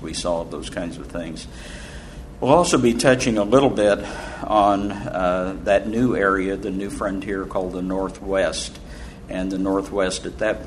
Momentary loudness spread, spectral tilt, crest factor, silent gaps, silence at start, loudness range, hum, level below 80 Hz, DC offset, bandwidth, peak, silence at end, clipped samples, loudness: 18 LU; -5 dB/octave; 22 dB; none; 0 s; 6 LU; none; -40 dBFS; under 0.1%; 12.5 kHz; 0 dBFS; 0 s; under 0.1%; -21 LUFS